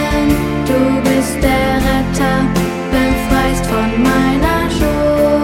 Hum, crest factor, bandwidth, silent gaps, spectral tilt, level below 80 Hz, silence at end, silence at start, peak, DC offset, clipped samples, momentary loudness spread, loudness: none; 12 dB; 17 kHz; none; -5.5 dB/octave; -24 dBFS; 0 s; 0 s; 0 dBFS; under 0.1%; under 0.1%; 3 LU; -14 LUFS